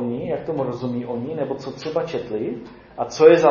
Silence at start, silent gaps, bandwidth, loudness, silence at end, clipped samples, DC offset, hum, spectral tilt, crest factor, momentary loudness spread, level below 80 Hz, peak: 0 s; none; 7.2 kHz; -22 LUFS; 0 s; under 0.1%; under 0.1%; none; -6.5 dB/octave; 20 dB; 15 LU; -56 dBFS; -2 dBFS